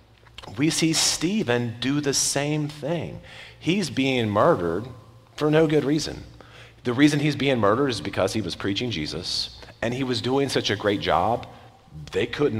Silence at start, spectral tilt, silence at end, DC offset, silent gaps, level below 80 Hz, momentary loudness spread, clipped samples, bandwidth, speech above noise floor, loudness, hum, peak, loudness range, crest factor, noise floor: 0.4 s; -4.5 dB/octave; 0 s; under 0.1%; none; -52 dBFS; 13 LU; under 0.1%; 16 kHz; 23 dB; -23 LUFS; none; -6 dBFS; 2 LU; 18 dB; -47 dBFS